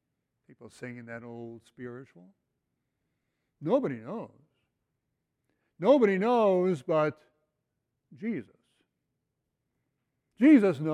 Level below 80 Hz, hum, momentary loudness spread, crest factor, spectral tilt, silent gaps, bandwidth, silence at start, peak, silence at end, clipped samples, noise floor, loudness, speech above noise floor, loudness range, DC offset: -78 dBFS; none; 23 LU; 20 dB; -8 dB/octave; none; 10 kHz; 0.6 s; -10 dBFS; 0 s; under 0.1%; -83 dBFS; -26 LUFS; 56 dB; 17 LU; under 0.1%